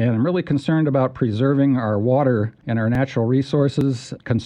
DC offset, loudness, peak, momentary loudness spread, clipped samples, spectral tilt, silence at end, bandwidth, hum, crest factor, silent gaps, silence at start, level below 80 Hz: under 0.1%; -20 LUFS; -6 dBFS; 5 LU; under 0.1%; -8.5 dB/octave; 0 s; 9.6 kHz; none; 12 dB; none; 0 s; -52 dBFS